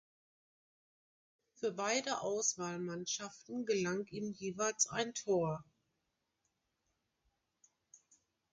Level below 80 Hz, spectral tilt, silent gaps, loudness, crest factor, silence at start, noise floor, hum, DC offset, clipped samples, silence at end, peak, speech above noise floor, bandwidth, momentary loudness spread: -78 dBFS; -3 dB/octave; none; -37 LUFS; 22 dB; 1.6 s; -85 dBFS; none; under 0.1%; under 0.1%; 0.55 s; -18 dBFS; 48 dB; 10 kHz; 8 LU